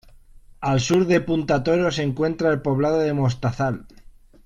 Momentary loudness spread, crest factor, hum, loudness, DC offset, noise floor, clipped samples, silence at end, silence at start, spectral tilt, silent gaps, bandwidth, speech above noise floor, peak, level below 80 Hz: 6 LU; 16 dB; none; -21 LUFS; under 0.1%; -47 dBFS; under 0.1%; 0.6 s; 0.6 s; -6.5 dB/octave; none; 12 kHz; 26 dB; -6 dBFS; -46 dBFS